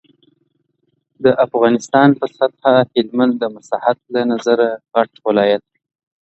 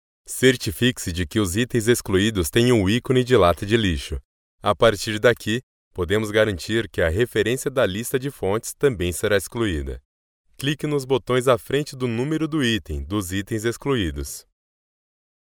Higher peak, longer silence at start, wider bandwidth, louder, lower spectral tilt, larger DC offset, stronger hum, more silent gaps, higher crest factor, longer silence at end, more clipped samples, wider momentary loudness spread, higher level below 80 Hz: first, 0 dBFS vs -4 dBFS; first, 1.2 s vs 0.3 s; second, 8.2 kHz vs 19.5 kHz; first, -16 LUFS vs -22 LUFS; about the same, -6 dB/octave vs -5 dB/octave; neither; neither; second, none vs 4.24-4.58 s, 5.63-5.91 s, 10.05-10.44 s; about the same, 16 dB vs 18 dB; second, 0.7 s vs 1.15 s; neither; second, 6 LU vs 9 LU; second, -62 dBFS vs -40 dBFS